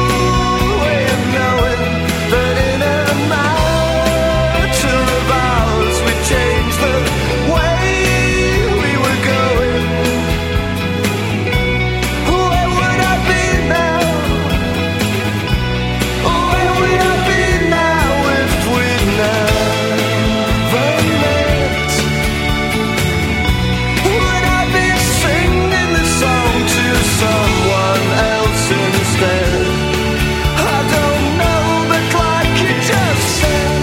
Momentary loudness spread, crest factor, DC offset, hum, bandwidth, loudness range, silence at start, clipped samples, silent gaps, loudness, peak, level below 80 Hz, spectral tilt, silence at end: 3 LU; 14 dB; under 0.1%; none; 16.5 kHz; 2 LU; 0 s; under 0.1%; none; -14 LUFS; 0 dBFS; -24 dBFS; -4.5 dB/octave; 0 s